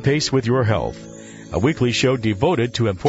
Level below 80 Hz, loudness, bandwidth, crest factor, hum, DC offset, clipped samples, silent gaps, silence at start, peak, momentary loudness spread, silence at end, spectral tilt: -44 dBFS; -20 LUFS; 8 kHz; 16 dB; none; under 0.1%; under 0.1%; none; 0 s; -4 dBFS; 14 LU; 0 s; -5.5 dB/octave